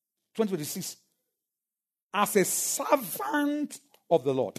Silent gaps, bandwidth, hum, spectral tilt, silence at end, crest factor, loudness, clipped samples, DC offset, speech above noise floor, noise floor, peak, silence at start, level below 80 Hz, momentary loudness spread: 2.03-2.09 s; 13.5 kHz; none; -3.5 dB/octave; 0.1 s; 20 dB; -28 LUFS; under 0.1%; under 0.1%; over 62 dB; under -90 dBFS; -10 dBFS; 0.35 s; -80 dBFS; 12 LU